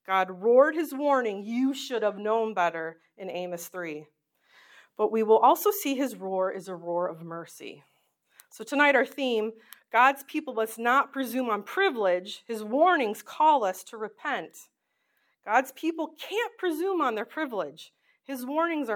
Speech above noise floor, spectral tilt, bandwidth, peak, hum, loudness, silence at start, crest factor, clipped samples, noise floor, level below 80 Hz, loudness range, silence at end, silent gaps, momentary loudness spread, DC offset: 48 dB; -4 dB/octave; 19 kHz; -8 dBFS; none; -27 LUFS; 0.1 s; 20 dB; under 0.1%; -75 dBFS; under -90 dBFS; 5 LU; 0 s; none; 16 LU; under 0.1%